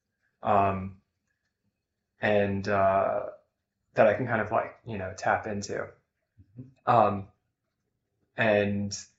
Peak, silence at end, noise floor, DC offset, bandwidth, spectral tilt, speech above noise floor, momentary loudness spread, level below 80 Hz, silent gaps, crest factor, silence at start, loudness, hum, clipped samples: -8 dBFS; 0.15 s; -82 dBFS; under 0.1%; 8 kHz; -5 dB/octave; 55 dB; 13 LU; -64 dBFS; none; 22 dB; 0.45 s; -27 LUFS; none; under 0.1%